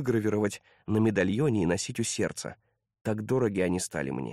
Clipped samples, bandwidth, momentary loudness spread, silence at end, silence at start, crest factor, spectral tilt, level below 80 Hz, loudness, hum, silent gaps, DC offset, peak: under 0.1%; 14.5 kHz; 9 LU; 0 s; 0 s; 16 dB; -5.5 dB/octave; -58 dBFS; -29 LUFS; none; 3.01-3.05 s; under 0.1%; -12 dBFS